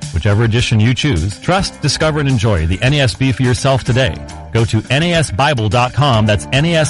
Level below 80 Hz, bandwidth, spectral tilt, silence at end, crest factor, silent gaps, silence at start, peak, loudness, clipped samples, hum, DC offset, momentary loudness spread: -30 dBFS; 11.5 kHz; -5.5 dB/octave; 0 s; 10 dB; none; 0 s; -4 dBFS; -14 LUFS; under 0.1%; none; under 0.1%; 3 LU